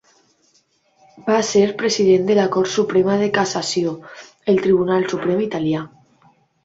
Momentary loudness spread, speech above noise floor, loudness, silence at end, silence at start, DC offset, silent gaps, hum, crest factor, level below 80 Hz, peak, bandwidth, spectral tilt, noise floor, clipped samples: 11 LU; 43 dB; -18 LUFS; 0.75 s; 1.15 s; under 0.1%; none; none; 16 dB; -58 dBFS; -4 dBFS; 8 kHz; -5 dB/octave; -61 dBFS; under 0.1%